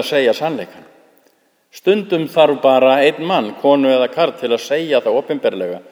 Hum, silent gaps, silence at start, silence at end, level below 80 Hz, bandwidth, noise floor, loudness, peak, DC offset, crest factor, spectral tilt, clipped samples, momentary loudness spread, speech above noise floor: none; none; 0 s; 0.1 s; -72 dBFS; over 20 kHz; -58 dBFS; -15 LUFS; 0 dBFS; under 0.1%; 16 dB; -5 dB/octave; under 0.1%; 9 LU; 43 dB